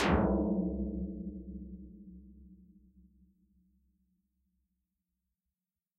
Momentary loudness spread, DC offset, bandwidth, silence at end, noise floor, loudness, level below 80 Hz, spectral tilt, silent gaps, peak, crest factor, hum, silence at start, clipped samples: 24 LU; under 0.1%; 2.6 kHz; 3.45 s; under -90 dBFS; -35 LUFS; -46 dBFS; -5.5 dB/octave; none; -16 dBFS; 22 dB; none; 0 s; under 0.1%